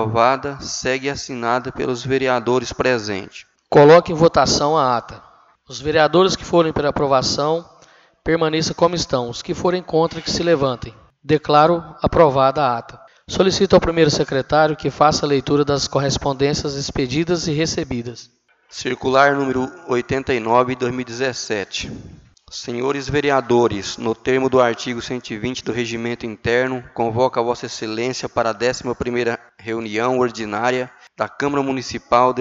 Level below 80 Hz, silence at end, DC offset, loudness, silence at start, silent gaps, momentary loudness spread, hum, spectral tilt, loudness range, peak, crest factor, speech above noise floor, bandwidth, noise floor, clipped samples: -44 dBFS; 0 s; under 0.1%; -18 LUFS; 0 s; none; 12 LU; none; -5 dB/octave; 6 LU; 0 dBFS; 18 dB; 33 dB; 8 kHz; -51 dBFS; under 0.1%